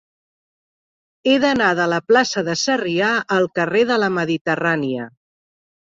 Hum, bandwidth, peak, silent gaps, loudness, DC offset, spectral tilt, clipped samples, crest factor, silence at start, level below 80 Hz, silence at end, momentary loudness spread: none; 7.8 kHz; -2 dBFS; 4.41-4.45 s; -18 LUFS; under 0.1%; -4.5 dB/octave; under 0.1%; 16 dB; 1.25 s; -62 dBFS; 0.75 s; 6 LU